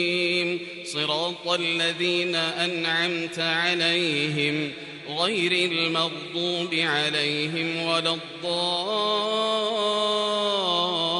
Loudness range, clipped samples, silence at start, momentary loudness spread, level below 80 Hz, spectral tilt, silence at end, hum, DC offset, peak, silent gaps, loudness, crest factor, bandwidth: 1 LU; under 0.1%; 0 s; 5 LU; -70 dBFS; -3.5 dB/octave; 0 s; none; under 0.1%; -8 dBFS; none; -24 LUFS; 16 dB; 11.5 kHz